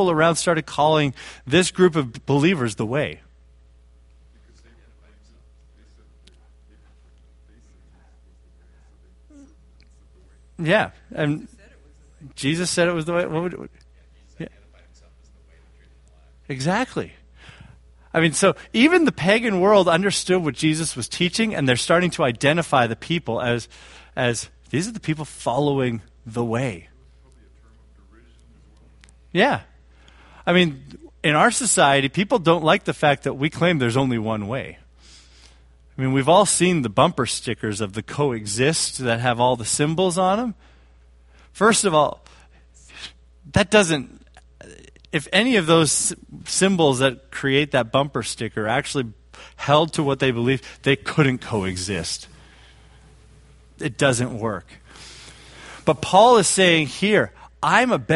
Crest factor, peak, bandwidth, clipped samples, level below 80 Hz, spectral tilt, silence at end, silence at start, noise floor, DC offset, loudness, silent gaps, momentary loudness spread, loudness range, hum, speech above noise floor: 22 dB; 0 dBFS; 11.5 kHz; under 0.1%; -50 dBFS; -4 dB/octave; 0 s; 0 s; -51 dBFS; under 0.1%; -20 LUFS; none; 14 LU; 9 LU; none; 31 dB